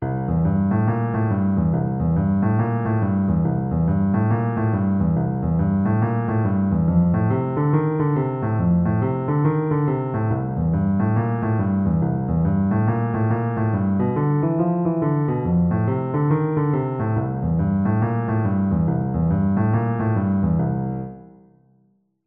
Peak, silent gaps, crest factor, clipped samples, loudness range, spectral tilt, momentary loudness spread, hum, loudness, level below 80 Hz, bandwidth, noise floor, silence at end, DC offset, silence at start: -6 dBFS; none; 14 dB; under 0.1%; 1 LU; -14 dB/octave; 2 LU; none; -21 LUFS; -42 dBFS; 3.2 kHz; -63 dBFS; 1.05 s; under 0.1%; 0 s